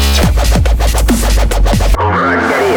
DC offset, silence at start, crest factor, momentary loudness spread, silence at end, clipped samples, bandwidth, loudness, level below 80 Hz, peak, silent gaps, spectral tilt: under 0.1%; 0 s; 10 dB; 1 LU; 0 s; under 0.1%; 19.5 kHz; -12 LUFS; -12 dBFS; 0 dBFS; none; -5 dB/octave